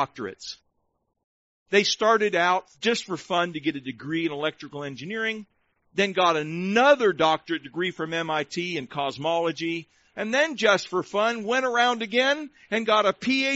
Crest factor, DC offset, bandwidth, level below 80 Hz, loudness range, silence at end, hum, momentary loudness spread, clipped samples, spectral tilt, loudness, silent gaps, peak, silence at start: 18 dB; under 0.1%; 8 kHz; -68 dBFS; 4 LU; 0 s; none; 13 LU; under 0.1%; -2 dB/octave; -24 LUFS; 1.24-1.66 s; -6 dBFS; 0 s